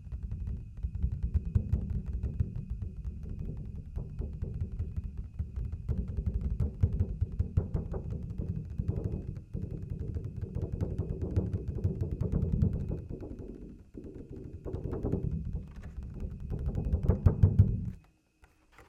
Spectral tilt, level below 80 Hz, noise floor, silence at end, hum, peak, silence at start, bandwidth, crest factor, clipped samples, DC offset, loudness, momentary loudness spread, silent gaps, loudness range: -11 dB/octave; -38 dBFS; -64 dBFS; 0.05 s; none; -10 dBFS; 0 s; 3.2 kHz; 24 dB; under 0.1%; under 0.1%; -35 LUFS; 12 LU; none; 8 LU